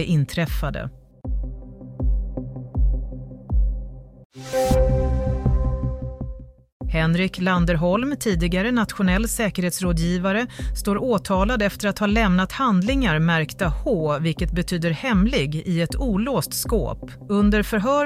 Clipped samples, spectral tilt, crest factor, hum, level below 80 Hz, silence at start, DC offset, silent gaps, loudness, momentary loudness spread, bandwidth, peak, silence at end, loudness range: under 0.1%; -6 dB/octave; 14 dB; none; -28 dBFS; 0 s; under 0.1%; 4.25-4.30 s, 6.72-6.80 s; -22 LUFS; 13 LU; 15.5 kHz; -6 dBFS; 0 s; 6 LU